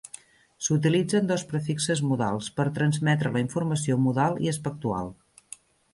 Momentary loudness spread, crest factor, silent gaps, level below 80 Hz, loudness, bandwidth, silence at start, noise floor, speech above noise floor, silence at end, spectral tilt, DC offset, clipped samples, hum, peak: 19 LU; 16 dB; none; -60 dBFS; -26 LUFS; 11.5 kHz; 0.6 s; -49 dBFS; 24 dB; 0.8 s; -5.5 dB/octave; under 0.1%; under 0.1%; none; -10 dBFS